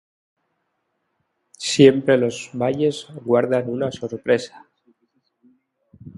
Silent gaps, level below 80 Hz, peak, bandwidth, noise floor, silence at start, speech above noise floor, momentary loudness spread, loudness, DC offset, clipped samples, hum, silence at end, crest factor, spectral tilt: none; -62 dBFS; 0 dBFS; 11.5 kHz; -73 dBFS; 1.6 s; 54 dB; 14 LU; -20 LUFS; under 0.1%; under 0.1%; none; 0.05 s; 22 dB; -5.5 dB/octave